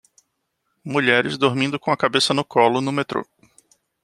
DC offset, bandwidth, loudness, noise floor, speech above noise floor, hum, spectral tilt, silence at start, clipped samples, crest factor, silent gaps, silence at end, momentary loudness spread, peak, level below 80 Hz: under 0.1%; 13 kHz; -20 LUFS; -74 dBFS; 54 dB; none; -4.5 dB/octave; 0.85 s; under 0.1%; 20 dB; none; 0.8 s; 8 LU; -2 dBFS; -64 dBFS